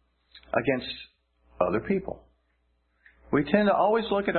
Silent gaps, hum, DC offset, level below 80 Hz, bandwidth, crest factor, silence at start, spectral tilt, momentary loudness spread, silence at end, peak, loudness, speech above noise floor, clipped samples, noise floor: none; none; under 0.1%; -56 dBFS; 4.4 kHz; 20 dB; 0.35 s; -10.5 dB/octave; 16 LU; 0 s; -8 dBFS; -26 LUFS; 46 dB; under 0.1%; -71 dBFS